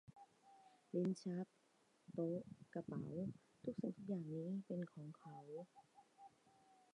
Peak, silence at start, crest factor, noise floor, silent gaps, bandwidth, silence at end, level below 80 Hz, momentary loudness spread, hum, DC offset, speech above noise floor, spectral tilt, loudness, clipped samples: -30 dBFS; 0.1 s; 18 dB; -77 dBFS; none; 10.5 kHz; 0.2 s; -84 dBFS; 23 LU; none; under 0.1%; 31 dB; -8.5 dB/octave; -48 LUFS; under 0.1%